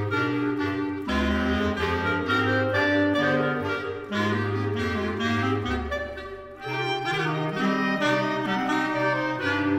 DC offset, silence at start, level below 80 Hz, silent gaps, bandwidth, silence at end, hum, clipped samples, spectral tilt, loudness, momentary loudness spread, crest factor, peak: under 0.1%; 0 s; -44 dBFS; none; 14.5 kHz; 0 s; none; under 0.1%; -6 dB/octave; -25 LUFS; 7 LU; 14 dB; -10 dBFS